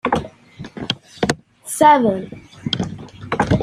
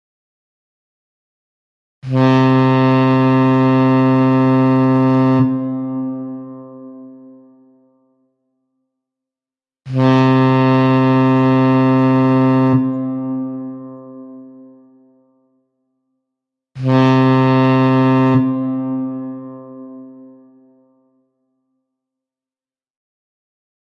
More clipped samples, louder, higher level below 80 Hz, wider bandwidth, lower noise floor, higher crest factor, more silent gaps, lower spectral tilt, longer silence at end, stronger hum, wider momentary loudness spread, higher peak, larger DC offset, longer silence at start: neither; second, -19 LUFS vs -14 LUFS; first, -44 dBFS vs -58 dBFS; first, 15.5 kHz vs 6.2 kHz; second, -38 dBFS vs under -90 dBFS; about the same, 18 dB vs 14 dB; neither; second, -5 dB/octave vs -9 dB/octave; second, 0 s vs 3.9 s; neither; about the same, 23 LU vs 21 LU; about the same, -2 dBFS vs -2 dBFS; neither; second, 0.05 s vs 2.05 s